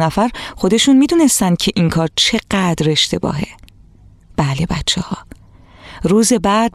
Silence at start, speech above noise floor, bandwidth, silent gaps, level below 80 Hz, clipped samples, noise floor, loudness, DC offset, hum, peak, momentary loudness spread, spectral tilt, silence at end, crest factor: 0 s; 30 dB; 15 kHz; none; -38 dBFS; under 0.1%; -44 dBFS; -15 LUFS; under 0.1%; none; -2 dBFS; 11 LU; -4 dB/octave; 0.05 s; 14 dB